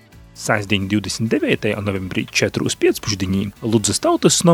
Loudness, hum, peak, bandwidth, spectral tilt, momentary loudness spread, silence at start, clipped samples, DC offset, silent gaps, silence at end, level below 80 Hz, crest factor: -19 LUFS; none; 0 dBFS; 17.5 kHz; -4 dB/octave; 6 LU; 0.35 s; under 0.1%; under 0.1%; none; 0 s; -48 dBFS; 18 dB